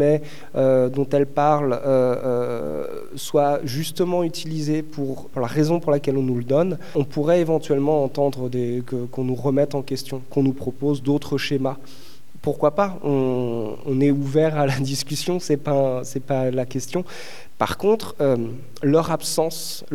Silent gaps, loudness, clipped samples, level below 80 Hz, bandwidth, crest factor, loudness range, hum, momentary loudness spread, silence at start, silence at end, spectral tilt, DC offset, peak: none; -22 LUFS; under 0.1%; -58 dBFS; 18.5 kHz; 18 dB; 3 LU; none; 9 LU; 0 s; 0 s; -6 dB/octave; 3%; -4 dBFS